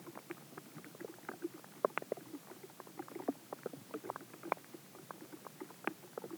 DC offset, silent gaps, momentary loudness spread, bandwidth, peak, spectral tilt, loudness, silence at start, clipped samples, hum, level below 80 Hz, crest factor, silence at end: under 0.1%; none; 12 LU; over 20 kHz; -14 dBFS; -4.5 dB/octave; -46 LUFS; 0 s; under 0.1%; none; under -90 dBFS; 32 dB; 0 s